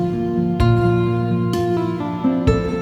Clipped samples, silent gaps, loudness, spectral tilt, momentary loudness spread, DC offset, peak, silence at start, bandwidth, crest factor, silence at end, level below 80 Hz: under 0.1%; none; -19 LUFS; -8.5 dB/octave; 5 LU; under 0.1%; -4 dBFS; 0 s; 12 kHz; 14 dB; 0 s; -32 dBFS